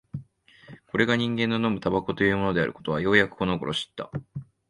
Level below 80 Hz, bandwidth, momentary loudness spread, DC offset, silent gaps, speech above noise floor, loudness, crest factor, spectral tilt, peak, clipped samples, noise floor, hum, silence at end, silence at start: -52 dBFS; 11.5 kHz; 15 LU; under 0.1%; none; 28 dB; -25 LUFS; 22 dB; -6 dB/octave; -4 dBFS; under 0.1%; -53 dBFS; none; 0.25 s; 0.15 s